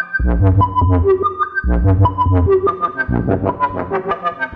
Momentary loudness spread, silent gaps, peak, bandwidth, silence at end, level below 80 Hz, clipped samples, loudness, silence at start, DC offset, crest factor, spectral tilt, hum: 6 LU; none; 0 dBFS; 4.5 kHz; 0 s; -24 dBFS; under 0.1%; -16 LUFS; 0 s; under 0.1%; 14 dB; -11 dB/octave; none